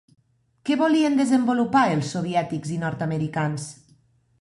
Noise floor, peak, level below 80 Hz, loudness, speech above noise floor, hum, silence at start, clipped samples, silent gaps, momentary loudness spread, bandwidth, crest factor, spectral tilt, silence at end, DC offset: -60 dBFS; -6 dBFS; -62 dBFS; -23 LUFS; 38 dB; none; 0.65 s; under 0.1%; none; 9 LU; 11.5 kHz; 16 dB; -6 dB/octave; 0.7 s; under 0.1%